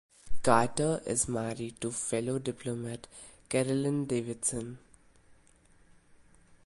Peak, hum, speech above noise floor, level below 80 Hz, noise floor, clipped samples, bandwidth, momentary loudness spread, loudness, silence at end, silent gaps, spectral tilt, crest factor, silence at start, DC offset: -8 dBFS; none; 31 dB; -56 dBFS; -62 dBFS; under 0.1%; 11.5 kHz; 18 LU; -31 LUFS; 1.9 s; none; -4.5 dB/octave; 24 dB; 0.25 s; under 0.1%